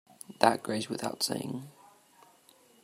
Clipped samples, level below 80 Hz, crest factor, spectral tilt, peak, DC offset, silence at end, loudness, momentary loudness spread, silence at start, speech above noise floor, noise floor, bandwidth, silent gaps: under 0.1%; -78 dBFS; 28 dB; -3.5 dB/octave; -4 dBFS; under 0.1%; 1.15 s; -31 LUFS; 19 LU; 0.3 s; 31 dB; -62 dBFS; 16 kHz; none